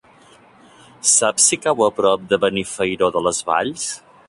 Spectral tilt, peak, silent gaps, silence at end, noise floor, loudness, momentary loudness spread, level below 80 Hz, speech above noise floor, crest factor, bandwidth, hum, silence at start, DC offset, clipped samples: -2 dB/octave; -2 dBFS; none; 0.3 s; -49 dBFS; -17 LUFS; 8 LU; -56 dBFS; 31 dB; 18 dB; 11.5 kHz; none; 1.05 s; under 0.1%; under 0.1%